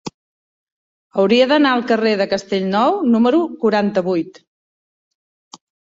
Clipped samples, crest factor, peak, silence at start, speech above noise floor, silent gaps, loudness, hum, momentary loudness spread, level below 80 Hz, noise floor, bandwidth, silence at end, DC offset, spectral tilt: under 0.1%; 16 dB; -2 dBFS; 0.05 s; over 74 dB; 0.14-1.10 s; -16 LUFS; none; 9 LU; -62 dBFS; under -90 dBFS; 7.8 kHz; 1.65 s; under 0.1%; -6 dB/octave